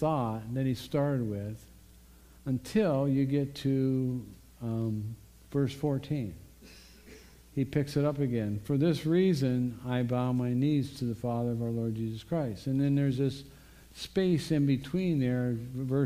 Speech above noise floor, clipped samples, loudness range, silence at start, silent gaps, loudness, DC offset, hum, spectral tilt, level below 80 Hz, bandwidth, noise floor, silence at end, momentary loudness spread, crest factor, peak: 26 dB; under 0.1%; 5 LU; 0 s; none; -31 LUFS; under 0.1%; none; -8 dB/octave; -56 dBFS; 15.5 kHz; -55 dBFS; 0 s; 10 LU; 16 dB; -14 dBFS